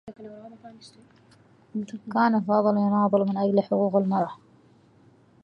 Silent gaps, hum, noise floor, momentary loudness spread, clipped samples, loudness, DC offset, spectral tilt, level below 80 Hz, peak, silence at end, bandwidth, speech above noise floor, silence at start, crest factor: none; none; -57 dBFS; 21 LU; under 0.1%; -24 LUFS; under 0.1%; -9 dB/octave; -72 dBFS; -8 dBFS; 1.1 s; 7 kHz; 33 dB; 0.05 s; 18 dB